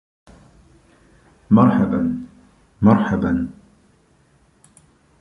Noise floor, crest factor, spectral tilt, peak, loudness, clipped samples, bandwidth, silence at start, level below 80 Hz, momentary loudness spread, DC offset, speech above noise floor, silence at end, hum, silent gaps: -57 dBFS; 18 dB; -9.5 dB/octave; -2 dBFS; -18 LUFS; under 0.1%; 10 kHz; 1.5 s; -46 dBFS; 16 LU; under 0.1%; 41 dB; 1.7 s; none; none